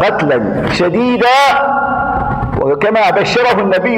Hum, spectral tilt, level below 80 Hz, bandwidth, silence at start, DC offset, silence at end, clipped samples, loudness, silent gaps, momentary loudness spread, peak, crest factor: none; -5.5 dB/octave; -34 dBFS; 17.5 kHz; 0 s; under 0.1%; 0 s; under 0.1%; -12 LUFS; none; 6 LU; 0 dBFS; 12 dB